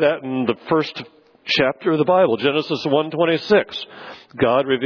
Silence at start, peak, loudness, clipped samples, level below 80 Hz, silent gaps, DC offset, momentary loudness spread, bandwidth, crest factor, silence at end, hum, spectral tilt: 0 s; -4 dBFS; -19 LUFS; under 0.1%; -60 dBFS; none; under 0.1%; 17 LU; 5.4 kHz; 16 dB; 0 s; none; -6.5 dB/octave